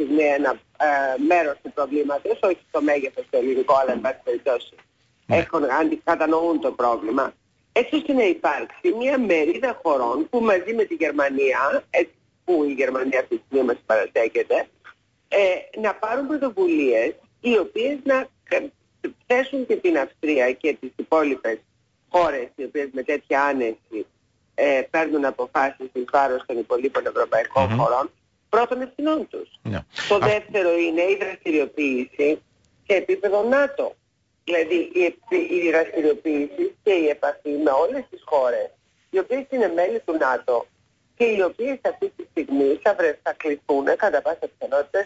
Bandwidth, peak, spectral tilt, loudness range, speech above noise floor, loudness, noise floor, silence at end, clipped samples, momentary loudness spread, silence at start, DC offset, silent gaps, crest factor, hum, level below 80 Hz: 8 kHz; -8 dBFS; -6 dB/octave; 2 LU; 30 dB; -22 LUFS; -51 dBFS; 0 s; under 0.1%; 8 LU; 0 s; under 0.1%; none; 14 dB; none; -60 dBFS